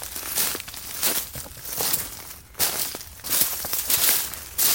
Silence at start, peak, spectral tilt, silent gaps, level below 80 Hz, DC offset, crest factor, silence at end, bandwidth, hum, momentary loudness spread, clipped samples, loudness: 0 s; -2 dBFS; 0 dB/octave; none; -52 dBFS; under 0.1%; 24 dB; 0 s; 17 kHz; none; 14 LU; under 0.1%; -23 LUFS